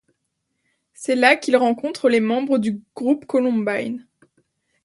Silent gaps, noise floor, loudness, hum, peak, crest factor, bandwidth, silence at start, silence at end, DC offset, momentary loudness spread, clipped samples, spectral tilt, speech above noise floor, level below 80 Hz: none; -75 dBFS; -20 LUFS; none; 0 dBFS; 20 dB; 11.5 kHz; 1 s; 0.85 s; under 0.1%; 11 LU; under 0.1%; -5 dB/octave; 56 dB; -70 dBFS